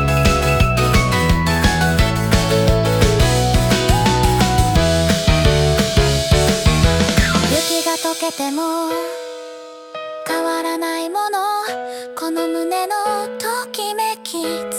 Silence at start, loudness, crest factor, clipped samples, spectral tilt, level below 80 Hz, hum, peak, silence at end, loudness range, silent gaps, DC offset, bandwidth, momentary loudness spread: 0 s; -17 LUFS; 16 dB; under 0.1%; -4.5 dB/octave; -24 dBFS; none; 0 dBFS; 0 s; 7 LU; none; under 0.1%; 18 kHz; 9 LU